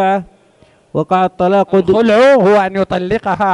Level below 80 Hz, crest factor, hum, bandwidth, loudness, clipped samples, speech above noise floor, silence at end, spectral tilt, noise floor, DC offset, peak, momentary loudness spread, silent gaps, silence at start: -46 dBFS; 12 dB; none; 11 kHz; -12 LUFS; under 0.1%; 38 dB; 0 s; -7 dB/octave; -49 dBFS; under 0.1%; -2 dBFS; 9 LU; none; 0 s